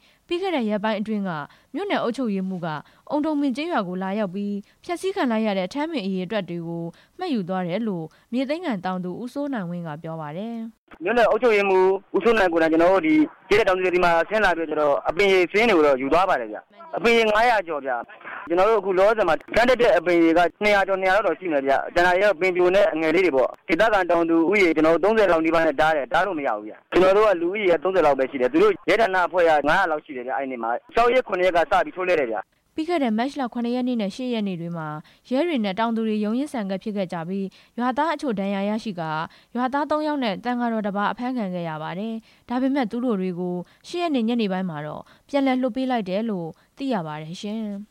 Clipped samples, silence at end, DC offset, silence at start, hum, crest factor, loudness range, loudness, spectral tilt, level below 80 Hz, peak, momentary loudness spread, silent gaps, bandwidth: under 0.1%; 0.05 s; under 0.1%; 0.3 s; none; 12 dB; 7 LU; -22 LUFS; -6 dB/octave; -50 dBFS; -10 dBFS; 13 LU; 10.78-10.87 s; 15.5 kHz